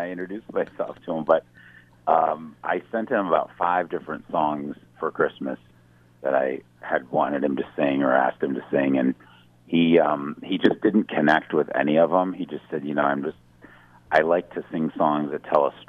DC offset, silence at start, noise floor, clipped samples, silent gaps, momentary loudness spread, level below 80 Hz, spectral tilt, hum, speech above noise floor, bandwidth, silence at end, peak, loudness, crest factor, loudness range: under 0.1%; 0 s; -55 dBFS; under 0.1%; none; 12 LU; -66 dBFS; -8 dB/octave; 60 Hz at -55 dBFS; 32 dB; 6.6 kHz; 0.05 s; -4 dBFS; -24 LUFS; 20 dB; 5 LU